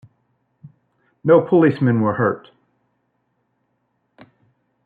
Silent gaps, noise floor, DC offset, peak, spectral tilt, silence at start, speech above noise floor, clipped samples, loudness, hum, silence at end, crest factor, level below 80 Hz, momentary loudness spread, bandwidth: none; -70 dBFS; under 0.1%; -2 dBFS; -11 dB/octave; 0.65 s; 54 dB; under 0.1%; -17 LUFS; 60 Hz at -45 dBFS; 2.45 s; 18 dB; -66 dBFS; 11 LU; 4.6 kHz